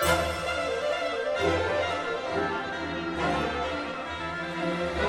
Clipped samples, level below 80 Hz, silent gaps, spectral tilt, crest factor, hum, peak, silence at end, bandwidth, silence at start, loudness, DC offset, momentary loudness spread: under 0.1%; -46 dBFS; none; -4.5 dB/octave; 18 dB; none; -10 dBFS; 0 s; 16 kHz; 0 s; -29 LUFS; under 0.1%; 6 LU